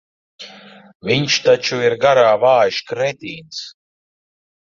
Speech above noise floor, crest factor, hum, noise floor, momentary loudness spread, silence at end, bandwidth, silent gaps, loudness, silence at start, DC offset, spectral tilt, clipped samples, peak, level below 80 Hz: 26 dB; 16 dB; none; -41 dBFS; 23 LU; 1.05 s; 7.4 kHz; 0.95-1.00 s; -15 LUFS; 0.4 s; under 0.1%; -4 dB/octave; under 0.1%; -2 dBFS; -60 dBFS